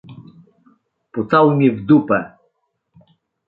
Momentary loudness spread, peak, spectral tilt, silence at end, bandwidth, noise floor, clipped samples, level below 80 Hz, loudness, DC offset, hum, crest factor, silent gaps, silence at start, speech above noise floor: 16 LU; -2 dBFS; -10.5 dB/octave; 1.2 s; 4.4 kHz; -69 dBFS; under 0.1%; -58 dBFS; -15 LUFS; under 0.1%; none; 18 dB; none; 0.1 s; 54 dB